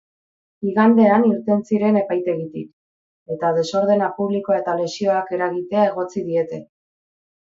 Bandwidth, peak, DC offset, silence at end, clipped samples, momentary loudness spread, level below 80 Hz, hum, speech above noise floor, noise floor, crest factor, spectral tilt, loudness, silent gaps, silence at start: 7.6 kHz; -2 dBFS; under 0.1%; 0.75 s; under 0.1%; 13 LU; -66 dBFS; none; over 71 dB; under -90 dBFS; 18 dB; -7 dB/octave; -19 LUFS; 2.73-3.26 s; 0.6 s